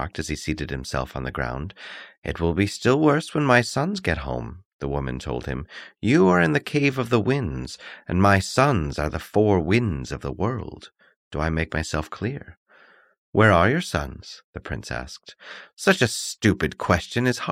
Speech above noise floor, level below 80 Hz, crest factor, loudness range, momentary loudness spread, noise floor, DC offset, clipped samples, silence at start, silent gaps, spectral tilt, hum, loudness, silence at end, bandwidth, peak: 32 dB; -40 dBFS; 20 dB; 4 LU; 17 LU; -55 dBFS; under 0.1%; under 0.1%; 0 s; 2.18-2.22 s, 4.65-4.79 s, 11.16-11.31 s, 12.57-12.66 s, 13.18-13.33 s, 14.44-14.53 s, 15.73-15.77 s; -5.5 dB/octave; none; -23 LUFS; 0 s; 16 kHz; -4 dBFS